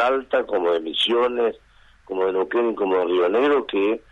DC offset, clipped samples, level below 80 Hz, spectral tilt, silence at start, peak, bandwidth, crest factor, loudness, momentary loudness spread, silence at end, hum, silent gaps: under 0.1%; under 0.1%; -58 dBFS; -4.5 dB/octave; 0 s; -8 dBFS; 10.5 kHz; 14 dB; -21 LUFS; 5 LU; 0.15 s; none; none